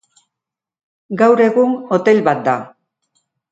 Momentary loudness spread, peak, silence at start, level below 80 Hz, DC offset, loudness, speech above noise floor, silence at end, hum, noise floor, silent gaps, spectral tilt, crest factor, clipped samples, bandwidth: 9 LU; 0 dBFS; 1.1 s; -66 dBFS; under 0.1%; -14 LUFS; 71 dB; 0.85 s; none; -84 dBFS; none; -7 dB/octave; 16 dB; under 0.1%; 7.8 kHz